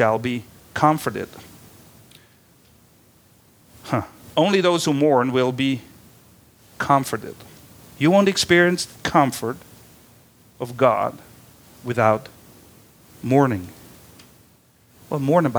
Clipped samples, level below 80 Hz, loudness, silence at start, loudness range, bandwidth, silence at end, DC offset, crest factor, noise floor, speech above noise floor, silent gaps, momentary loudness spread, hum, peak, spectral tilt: under 0.1%; -58 dBFS; -20 LUFS; 0 s; 7 LU; over 20 kHz; 0 s; under 0.1%; 22 dB; -55 dBFS; 36 dB; none; 17 LU; none; -2 dBFS; -5 dB/octave